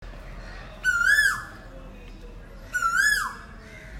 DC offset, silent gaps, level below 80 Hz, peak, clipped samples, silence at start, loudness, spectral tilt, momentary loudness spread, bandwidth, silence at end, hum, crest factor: under 0.1%; none; -44 dBFS; -8 dBFS; under 0.1%; 0 s; -22 LUFS; -1 dB/octave; 26 LU; 16 kHz; 0 s; none; 18 dB